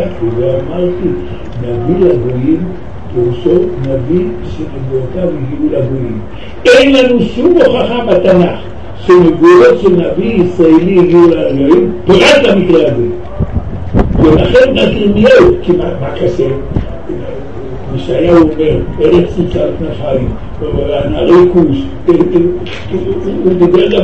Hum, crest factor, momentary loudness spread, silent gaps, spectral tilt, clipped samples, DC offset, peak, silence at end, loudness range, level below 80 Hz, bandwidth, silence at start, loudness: none; 10 dB; 14 LU; none; -7 dB/octave; 1%; 7%; 0 dBFS; 0 s; 6 LU; -26 dBFS; 8.8 kHz; 0 s; -10 LUFS